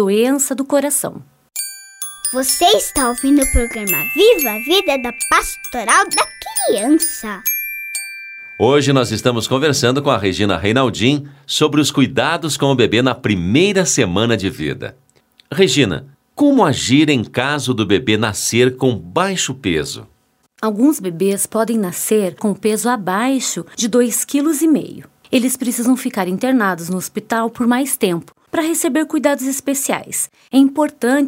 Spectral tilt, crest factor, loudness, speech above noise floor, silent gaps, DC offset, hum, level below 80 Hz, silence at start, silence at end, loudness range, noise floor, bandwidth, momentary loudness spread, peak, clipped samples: -4 dB/octave; 16 dB; -16 LUFS; 38 dB; none; under 0.1%; none; -38 dBFS; 0 s; 0 s; 3 LU; -53 dBFS; 16.5 kHz; 9 LU; 0 dBFS; under 0.1%